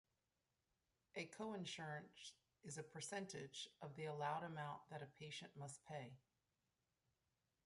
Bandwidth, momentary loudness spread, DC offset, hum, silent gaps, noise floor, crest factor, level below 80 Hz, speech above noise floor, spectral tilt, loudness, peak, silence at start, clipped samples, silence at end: 11.5 kHz; 11 LU; under 0.1%; none; none; under -90 dBFS; 20 dB; -88 dBFS; over 38 dB; -4 dB/octave; -52 LUFS; -34 dBFS; 1.15 s; under 0.1%; 1.45 s